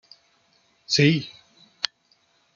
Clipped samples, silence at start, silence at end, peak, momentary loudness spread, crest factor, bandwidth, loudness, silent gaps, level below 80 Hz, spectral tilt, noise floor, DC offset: under 0.1%; 0.9 s; 0.7 s; 0 dBFS; 11 LU; 26 dB; 7.4 kHz; -23 LUFS; none; -64 dBFS; -4.5 dB/octave; -65 dBFS; under 0.1%